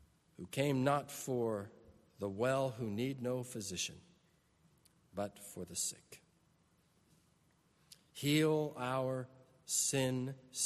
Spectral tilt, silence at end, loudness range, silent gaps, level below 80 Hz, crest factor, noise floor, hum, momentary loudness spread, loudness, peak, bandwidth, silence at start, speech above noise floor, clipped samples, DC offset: -4 dB/octave; 0 s; 9 LU; none; -74 dBFS; 20 dB; -73 dBFS; none; 16 LU; -37 LUFS; -20 dBFS; 13.5 kHz; 0.4 s; 36 dB; under 0.1%; under 0.1%